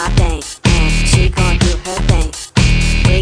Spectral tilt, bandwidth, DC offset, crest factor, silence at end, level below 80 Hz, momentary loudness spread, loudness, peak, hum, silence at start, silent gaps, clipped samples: -4.5 dB/octave; 10.5 kHz; under 0.1%; 12 dB; 0 s; -16 dBFS; 5 LU; -14 LUFS; 0 dBFS; none; 0 s; none; under 0.1%